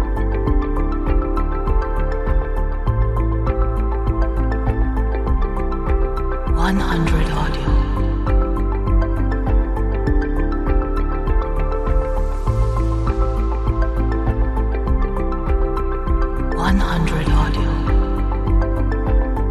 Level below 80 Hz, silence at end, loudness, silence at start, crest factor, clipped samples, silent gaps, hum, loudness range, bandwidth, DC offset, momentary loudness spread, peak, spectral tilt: -18 dBFS; 0 s; -21 LUFS; 0 s; 14 dB; under 0.1%; none; none; 1 LU; 7.2 kHz; under 0.1%; 4 LU; -4 dBFS; -8 dB/octave